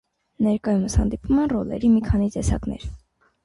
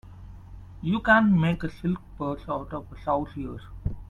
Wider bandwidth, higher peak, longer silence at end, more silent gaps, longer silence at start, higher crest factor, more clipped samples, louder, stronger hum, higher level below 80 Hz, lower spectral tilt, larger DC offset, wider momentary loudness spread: first, 11.5 kHz vs 7.2 kHz; second, -8 dBFS vs -4 dBFS; first, 0.5 s vs 0.05 s; neither; first, 0.4 s vs 0.05 s; second, 14 dB vs 22 dB; neither; first, -22 LUFS vs -26 LUFS; neither; first, -32 dBFS vs -44 dBFS; second, -7 dB/octave vs -8.5 dB/octave; neither; second, 9 LU vs 27 LU